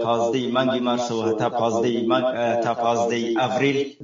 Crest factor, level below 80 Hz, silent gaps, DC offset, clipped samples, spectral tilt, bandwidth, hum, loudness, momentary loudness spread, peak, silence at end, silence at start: 14 dB; -66 dBFS; none; under 0.1%; under 0.1%; -5 dB/octave; 7.6 kHz; none; -22 LUFS; 2 LU; -8 dBFS; 0 s; 0 s